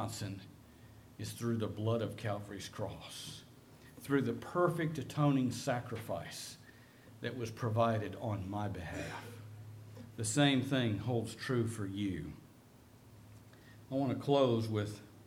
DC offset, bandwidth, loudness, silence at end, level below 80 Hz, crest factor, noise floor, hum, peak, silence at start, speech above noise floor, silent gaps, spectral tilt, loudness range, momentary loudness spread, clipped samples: under 0.1%; 16.5 kHz; -36 LUFS; 0 s; -66 dBFS; 20 dB; -60 dBFS; none; -16 dBFS; 0 s; 24 dB; none; -5.5 dB/octave; 5 LU; 20 LU; under 0.1%